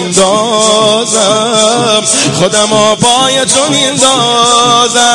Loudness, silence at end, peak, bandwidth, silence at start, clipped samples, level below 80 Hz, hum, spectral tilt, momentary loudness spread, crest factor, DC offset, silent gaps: -7 LUFS; 0 s; 0 dBFS; 12 kHz; 0 s; 0.6%; -46 dBFS; none; -2 dB/octave; 2 LU; 8 dB; 0.4%; none